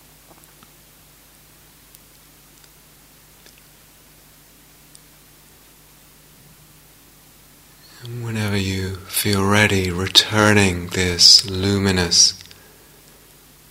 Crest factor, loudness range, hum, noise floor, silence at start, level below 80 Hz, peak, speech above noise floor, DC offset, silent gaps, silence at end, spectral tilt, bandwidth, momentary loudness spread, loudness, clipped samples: 22 dB; 16 LU; none; -49 dBFS; 8 s; -50 dBFS; 0 dBFS; 33 dB; under 0.1%; none; 1.3 s; -3 dB/octave; 16 kHz; 17 LU; -15 LUFS; under 0.1%